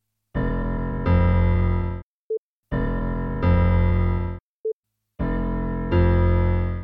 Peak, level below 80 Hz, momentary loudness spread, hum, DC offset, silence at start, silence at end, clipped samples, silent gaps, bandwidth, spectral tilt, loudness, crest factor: -8 dBFS; -28 dBFS; 13 LU; none; under 0.1%; 0.35 s; 0 s; under 0.1%; 2.03-2.30 s, 2.38-2.63 s, 4.40-4.64 s, 4.73-4.83 s; 4.4 kHz; -11 dB/octave; -23 LUFS; 14 dB